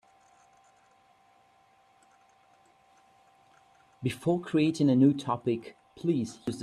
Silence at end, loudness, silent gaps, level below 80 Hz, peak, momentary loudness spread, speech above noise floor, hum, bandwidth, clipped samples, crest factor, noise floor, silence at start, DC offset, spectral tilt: 0 s; -28 LUFS; none; -70 dBFS; -12 dBFS; 12 LU; 37 dB; none; 12.5 kHz; under 0.1%; 20 dB; -64 dBFS; 4 s; under 0.1%; -7 dB/octave